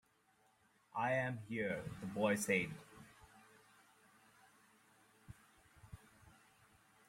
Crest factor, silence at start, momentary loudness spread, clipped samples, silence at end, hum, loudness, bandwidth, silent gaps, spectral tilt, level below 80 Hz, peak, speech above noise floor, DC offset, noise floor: 24 dB; 0.95 s; 25 LU; under 0.1%; 0.75 s; none; -39 LUFS; 16.5 kHz; none; -5 dB/octave; -72 dBFS; -22 dBFS; 36 dB; under 0.1%; -75 dBFS